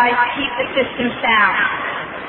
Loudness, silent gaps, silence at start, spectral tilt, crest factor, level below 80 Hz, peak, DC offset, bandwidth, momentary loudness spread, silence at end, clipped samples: -17 LUFS; none; 0 s; -7 dB/octave; 16 dB; -50 dBFS; -2 dBFS; under 0.1%; 4.2 kHz; 8 LU; 0 s; under 0.1%